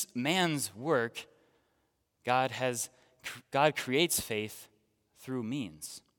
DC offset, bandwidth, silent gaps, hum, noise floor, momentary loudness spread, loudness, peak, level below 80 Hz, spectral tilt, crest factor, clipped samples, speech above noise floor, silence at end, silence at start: under 0.1%; 18 kHz; none; none; -77 dBFS; 16 LU; -32 LUFS; -10 dBFS; -72 dBFS; -3.5 dB/octave; 24 dB; under 0.1%; 45 dB; 0.2 s; 0 s